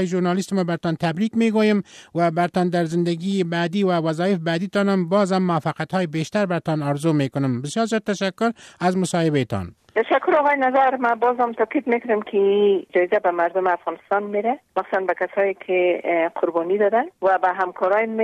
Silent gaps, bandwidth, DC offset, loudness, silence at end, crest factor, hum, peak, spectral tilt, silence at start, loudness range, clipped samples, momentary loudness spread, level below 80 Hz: none; 13 kHz; under 0.1%; -21 LUFS; 0 s; 14 dB; none; -8 dBFS; -6.5 dB/octave; 0 s; 3 LU; under 0.1%; 6 LU; -64 dBFS